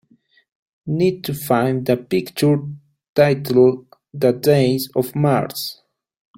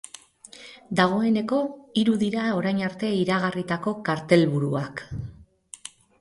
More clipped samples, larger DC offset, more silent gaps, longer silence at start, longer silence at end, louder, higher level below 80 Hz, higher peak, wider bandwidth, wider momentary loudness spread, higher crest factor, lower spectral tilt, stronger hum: neither; neither; first, 3.09-3.13 s vs none; first, 0.85 s vs 0.55 s; first, 0.65 s vs 0.35 s; first, -18 LUFS vs -24 LUFS; about the same, -56 dBFS vs -56 dBFS; first, -2 dBFS vs -6 dBFS; first, 16.5 kHz vs 11.5 kHz; second, 12 LU vs 22 LU; about the same, 16 dB vs 20 dB; about the same, -6.5 dB/octave vs -6 dB/octave; neither